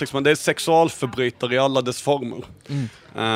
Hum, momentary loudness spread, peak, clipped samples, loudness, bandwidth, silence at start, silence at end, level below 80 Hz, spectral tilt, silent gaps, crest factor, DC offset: none; 12 LU; -2 dBFS; under 0.1%; -21 LUFS; 16 kHz; 0 s; 0 s; -60 dBFS; -4.5 dB/octave; none; 18 dB; under 0.1%